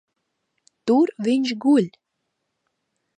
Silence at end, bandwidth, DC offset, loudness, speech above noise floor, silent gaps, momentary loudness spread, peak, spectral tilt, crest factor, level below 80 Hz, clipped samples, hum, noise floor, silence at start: 1.3 s; 9.8 kHz; under 0.1%; -21 LUFS; 58 dB; none; 10 LU; -8 dBFS; -6 dB/octave; 16 dB; -76 dBFS; under 0.1%; none; -77 dBFS; 0.85 s